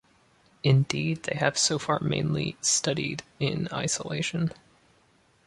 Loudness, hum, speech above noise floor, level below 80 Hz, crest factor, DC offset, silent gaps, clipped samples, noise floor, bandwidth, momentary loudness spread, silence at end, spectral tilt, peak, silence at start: -27 LUFS; none; 37 dB; -58 dBFS; 22 dB; under 0.1%; none; under 0.1%; -63 dBFS; 11.5 kHz; 7 LU; 0.95 s; -4 dB/octave; -6 dBFS; 0.65 s